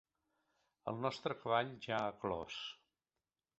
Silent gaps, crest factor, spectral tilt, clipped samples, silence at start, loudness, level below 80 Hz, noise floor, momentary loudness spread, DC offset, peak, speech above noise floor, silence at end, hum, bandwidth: none; 22 dB; -3 dB/octave; under 0.1%; 0.85 s; -41 LUFS; -72 dBFS; under -90 dBFS; 12 LU; under 0.1%; -20 dBFS; over 50 dB; 0.85 s; none; 8 kHz